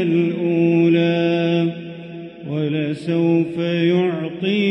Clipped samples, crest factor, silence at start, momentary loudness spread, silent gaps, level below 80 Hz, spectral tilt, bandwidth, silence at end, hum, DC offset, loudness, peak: under 0.1%; 12 dB; 0 s; 15 LU; none; -64 dBFS; -8.5 dB/octave; 6 kHz; 0 s; none; under 0.1%; -19 LUFS; -6 dBFS